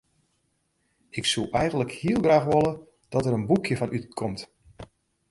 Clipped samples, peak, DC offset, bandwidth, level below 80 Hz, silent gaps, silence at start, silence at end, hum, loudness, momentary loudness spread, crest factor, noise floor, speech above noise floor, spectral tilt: under 0.1%; -8 dBFS; under 0.1%; 11.5 kHz; -52 dBFS; none; 1.15 s; 0.45 s; none; -25 LUFS; 14 LU; 20 dB; -72 dBFS; 48 dB; -5.5 dB/octave